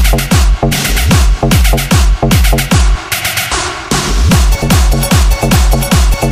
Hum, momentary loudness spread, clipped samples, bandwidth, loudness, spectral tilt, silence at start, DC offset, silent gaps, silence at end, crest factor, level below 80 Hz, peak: none; 3 LU; under 0.1%; 16 kHz; -10 LUFS; -4.5 dB/octave; 0 s; under 0.1%; none; 0 s; 8 dB; -12 dBFS; 0 dBFS